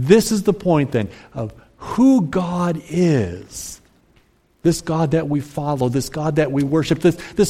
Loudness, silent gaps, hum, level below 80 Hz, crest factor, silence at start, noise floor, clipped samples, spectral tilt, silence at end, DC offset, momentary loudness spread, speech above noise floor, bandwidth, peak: -19 LUFS; none; none; -46 dBFS; 18 dB; 0 s; -57 dBFS; under 0.1%; -6.5 dB/octave; 0 s; under 0.1%; 15 LU; 39 dB; 16 kHz; 0 dBFS